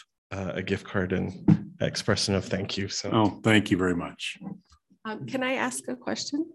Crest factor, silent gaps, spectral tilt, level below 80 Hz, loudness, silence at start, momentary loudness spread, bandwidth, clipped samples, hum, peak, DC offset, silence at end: 22 dB; none; -5 dB/octave; -50 dBFS; -27 LUFS; 0.3 s; 14 LU; 12.5 kHz; under 0.1%; none; -6 dBFS; under 0.1%; 0.05 s